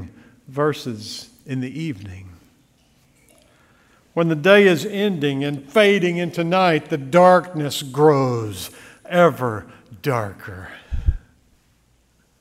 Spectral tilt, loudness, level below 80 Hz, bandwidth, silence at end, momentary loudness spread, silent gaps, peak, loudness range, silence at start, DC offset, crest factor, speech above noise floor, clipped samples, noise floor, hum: -6 dB/octave; -19 LUFS; -38 dBFS; 16 kHz; 1.2 s; 20 LU; none; 0 dBFS; 12 LU; 0 s; under 0.1%; 20 dB; 42 dB; under 0.1%; -60 dBFS; none